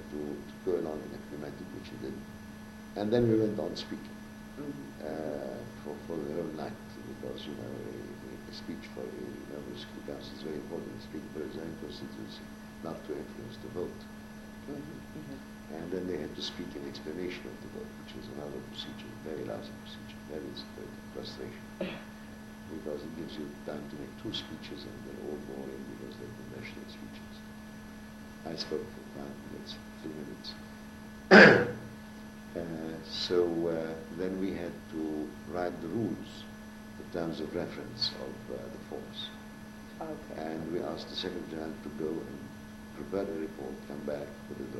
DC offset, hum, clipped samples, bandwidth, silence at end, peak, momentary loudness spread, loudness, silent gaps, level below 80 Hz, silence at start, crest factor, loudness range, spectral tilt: under 0.1%; none; under 0.1%; 16 kHz; 0 s; -4 dBFS; 13 LU; -34 LUFS; none; -58 dBFS; 0 s; 30 dB; 17 LU; -5.5 dB/octave